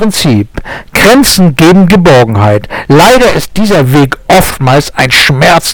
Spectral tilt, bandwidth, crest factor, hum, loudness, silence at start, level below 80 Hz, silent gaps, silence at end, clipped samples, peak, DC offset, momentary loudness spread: -5 dB/octave; 19.5 kHz; 6 dB; none; -5 LUFS; 0 s; -26 dBFS; none; 0 s; 1%; 0 dBFS; under 0.1%; 7 LU